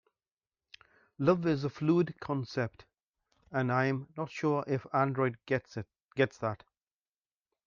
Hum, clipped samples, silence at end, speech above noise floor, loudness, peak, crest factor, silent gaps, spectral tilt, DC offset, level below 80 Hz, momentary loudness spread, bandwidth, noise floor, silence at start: none; under 0.1%; 1.1 s; over 59 dB; -32 LUFS; -12 dBFS; 22 dB; 3.03-3.13 s, 6.04-6.08 s; -8 dB/octave; under 0.1%; -70 dBFS; 10 LU; 7.2 kHz; under -90 dBFS; 1.2 s